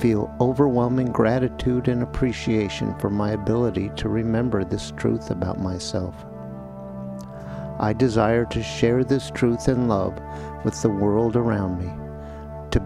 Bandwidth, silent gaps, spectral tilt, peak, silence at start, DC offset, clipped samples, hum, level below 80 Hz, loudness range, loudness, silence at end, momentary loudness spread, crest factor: 12 kHz; none; -7 dB/octave; -4 dBFS; 0 s; under 0.1%; under 0.1%; none; -40 dBFS; 5 LU; -23 LUFS; 0 s; 15 LU; 18 dB